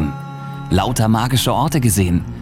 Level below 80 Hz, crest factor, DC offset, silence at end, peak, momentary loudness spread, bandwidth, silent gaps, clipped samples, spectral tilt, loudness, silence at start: -34 dBFS; 14 dB; under 0.1%; 0 s; -4 dBFS; 14 LU; 17 kHz; none; under 0.1%; -5 dB/octave; -17 LUFS; 0 s